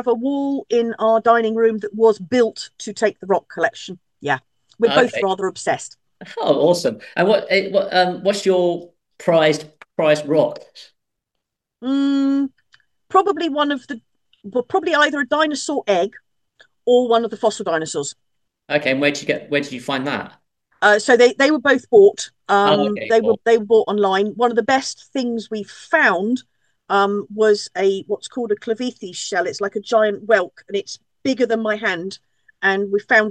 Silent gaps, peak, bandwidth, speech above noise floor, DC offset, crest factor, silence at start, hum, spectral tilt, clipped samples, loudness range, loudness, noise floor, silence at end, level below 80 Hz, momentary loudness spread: none; -2 dBFS; 12 kHz; 62 dB; under 0.1%; 18 dB; 0 s; none; -4 dB/octave; under 0.1%; 6 LU; -18 LUFS; -80 dBFS; 0 s; -70 dBFS; 11 LU